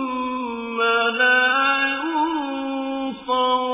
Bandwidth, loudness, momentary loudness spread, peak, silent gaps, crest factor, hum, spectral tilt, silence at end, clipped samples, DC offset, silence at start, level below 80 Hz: 3.9 kHz; -20 LUFS; 11 LU; -6 dBFS; none; 14 dB; none; -6 dB/octave; 0 s; under 0.1%; under 0.1%; 0 s; -60 dBFS